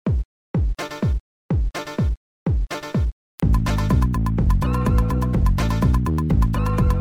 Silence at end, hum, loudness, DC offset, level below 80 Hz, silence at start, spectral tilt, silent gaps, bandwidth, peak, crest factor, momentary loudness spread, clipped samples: 0 s; none; -22 LUFS; under 0.1%; -22 dBFS; 0.05 s; -7.5 dB/octave; 0.25-0.54 s, 1.20-1.49 s, 2.17-2.46 s, 3.12-3.38 s; 15.5 kHz; -6 dBFS; 14 dB; 6 LU; under 0.1%